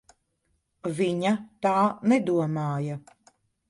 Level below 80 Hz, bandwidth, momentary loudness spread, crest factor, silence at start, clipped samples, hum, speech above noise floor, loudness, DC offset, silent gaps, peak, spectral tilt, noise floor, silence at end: -68 dBFS; 11.5 kHz; 11 LU; 18 dB; 0.85 s; under 0.1%; none; 49 dB; -26 LUFS; under 0.1%; none; -10 dBFS; -7 dB/octave; -74 dBFS; 0.7 s